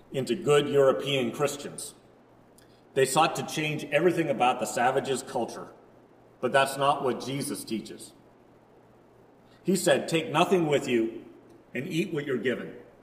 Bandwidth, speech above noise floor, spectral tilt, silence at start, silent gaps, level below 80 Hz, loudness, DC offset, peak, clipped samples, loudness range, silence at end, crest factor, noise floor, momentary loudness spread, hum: 16 kHz; 30 dB; -4.5 dB/octave; 0.1 s; none; -70 dBFS; -27 LUFS; under 0.1%; -6 dBFS; under 0.1%; 4 LU; 0.2 s; 22 dB; -57 dBFS; 14 LU; none